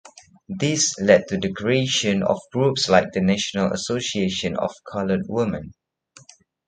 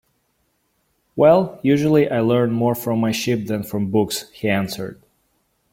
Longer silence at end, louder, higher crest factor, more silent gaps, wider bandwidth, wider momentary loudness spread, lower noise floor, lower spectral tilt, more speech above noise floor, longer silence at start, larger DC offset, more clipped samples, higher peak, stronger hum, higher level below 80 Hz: first, 0.95 s vs 0.8 s; about the same, -21 LUFS vs -19 LUFS; about the same, 22 dB vs 18 dB; neither; second, 9.4 kHz vs 16.5 kHz; about the same, 9 LU vs 10 LU; second, -52 dBFS vs -67 dBFS; second, -4 dB/octave vs -6 dB/octave; second, 30 dB vs 49 dB; second, 0.05 s vs 1.15 s; neither; neither; about the same, -2 dBFS vs -2 dBFS; neither; about the same, -52 dBFS vs -56 dBFS